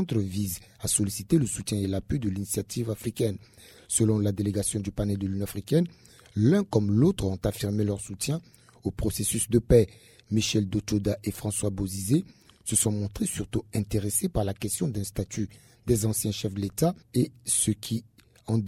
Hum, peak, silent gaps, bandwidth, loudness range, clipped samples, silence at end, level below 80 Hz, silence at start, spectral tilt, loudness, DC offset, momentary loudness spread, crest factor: none; -6 dBFS; none; 16 kHz; 2 LU; under 0.1%; 0 s; -46 dBFS; 0 s; -5.5 dB/octave; -27 LUFS; under 0.1%; 9 LU; 20 dB